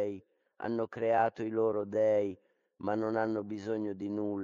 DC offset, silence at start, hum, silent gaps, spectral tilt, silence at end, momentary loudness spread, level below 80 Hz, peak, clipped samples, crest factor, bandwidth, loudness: under 0.1%; 0 s; none; none; -8 dB/octave; 0 s; 10 LU; -76 dBFS; -16 dBFS; under 0.1%; 18 dB; 7.4 kHz; -33 LUFS